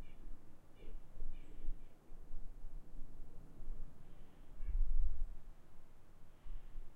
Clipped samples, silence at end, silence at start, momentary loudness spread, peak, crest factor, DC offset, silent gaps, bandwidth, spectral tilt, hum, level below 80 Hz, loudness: under 0.1%; 0 s; 0 s; 20 LU; -22 dBFS; 16 dB; under 0.1%; none; 2.4 kHz; -7.5 dB/octave; none; -42 dBFS; -52 LUFS